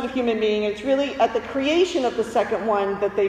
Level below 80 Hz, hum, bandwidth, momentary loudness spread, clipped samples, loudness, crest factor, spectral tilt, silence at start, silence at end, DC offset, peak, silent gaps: -54 dBFS; none; 12 kHz; 4 LU; under 0.1%; -22 LUFS; 14 dB; -4.5 dB/octave; 0 s; 0 s; under 0.1%; -6 dBFS; none